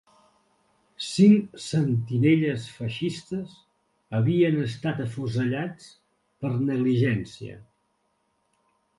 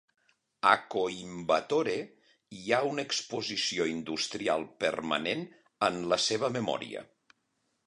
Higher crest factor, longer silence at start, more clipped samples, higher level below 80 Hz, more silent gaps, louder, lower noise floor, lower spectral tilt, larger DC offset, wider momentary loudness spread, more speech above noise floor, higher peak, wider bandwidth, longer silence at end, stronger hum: about the same, 20 dB vs 24 dB; first, 1 s vs 0.65 s; neither; first, -62 dBFS vs -70 dBFS; neither; first, -25 LUFS vs -30 LUFS; second, -72 dBFS vs -78 dBFS; first, -7 dB/octave vs -3 dB/octave; neither; first, 15 LU vs 10 LU; about the same, 48 dB vs 47 dB; about the same, -6 dBFS vs -8 dBFS; about the same, 11.5 kHz vs 11 kHz; first, 1.35 s vs 0.85 s; neither